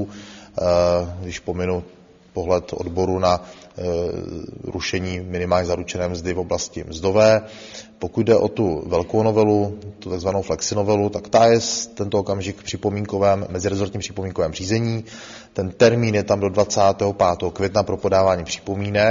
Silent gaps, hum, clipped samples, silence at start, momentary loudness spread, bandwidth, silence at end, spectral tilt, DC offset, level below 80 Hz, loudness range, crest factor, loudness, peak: none; none; under 0.1%; 0 s; 13 LU; 7.6 kHz; 0 s; -5 dB/octave; under 0.1%; -46 dBFS; 5 LU; 20 dB; -21 LUFS; 0 dBFS